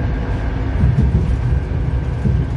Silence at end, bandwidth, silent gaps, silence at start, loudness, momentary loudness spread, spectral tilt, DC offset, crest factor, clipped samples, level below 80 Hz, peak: 0 s; 6.6 kHz; none; 0 s; -19 LUFS; 6 LU; -9 dB/octave; under 0.1%; 14 dB; under 0.1%; -20 dBFS; -2 dBFS